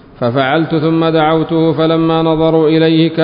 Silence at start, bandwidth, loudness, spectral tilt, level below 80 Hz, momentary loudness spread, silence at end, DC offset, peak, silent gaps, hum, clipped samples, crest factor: 0.2 s; 5.2 kHz; -12 LUFS; -12.5 dB/octave; -44 dBFS; 3 LU; 0 s; under 0.1%; 0 dBFS; none; none; under 0.1%; 10 dB